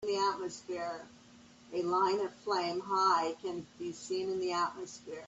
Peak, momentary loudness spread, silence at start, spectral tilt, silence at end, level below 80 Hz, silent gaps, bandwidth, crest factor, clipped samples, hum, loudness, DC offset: -16 dBFS; 13 LU; 0 s; -4 dB/octave; 0 s; -76 dBFS; none; 8.2 kHz; 18 dB; under 0.1%; none; -34 LUFS; under 0.1%